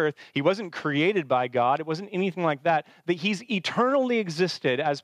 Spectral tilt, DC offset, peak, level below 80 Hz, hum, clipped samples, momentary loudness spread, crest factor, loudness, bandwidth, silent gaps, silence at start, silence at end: -5.5 dB/octave; under 0.1%; -8 dBFS; -82 dBFS; none; under 0.1%; 5 LU; 16 dB; -26 LUFS; 12 kHz; none; 0 s; 0.05 s